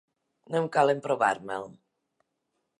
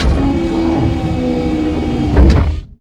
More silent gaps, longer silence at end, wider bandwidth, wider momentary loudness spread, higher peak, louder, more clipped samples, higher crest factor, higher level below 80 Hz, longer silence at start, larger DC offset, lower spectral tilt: neither; first, 1.05 s vs 0.05 s; first, 11.5 kHz vs 9 kHz; first, 13 LU vs 6 LU; second, -8 dBFS vs 0 dBFS; second, -27 LUFS vs -14 LUFS; second, under 0.1% vs 0.2%; first, 22 dB vs 12 dB; second, -78 dBFS vs -16 dBFS; first, 0.5 s vs 0 s; neither; second, -5.5 dB/octave vs -8 dB/octave